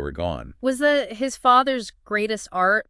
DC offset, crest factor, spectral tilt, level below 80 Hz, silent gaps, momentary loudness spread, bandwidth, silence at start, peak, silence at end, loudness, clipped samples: under 0.1%; 18 dB; -4 dB/octave; -46 dBFS; none; 11 LU; 12 kHz; 0 s; -4 dBFS; 0.05 s; -22 LUFS; under 0.1%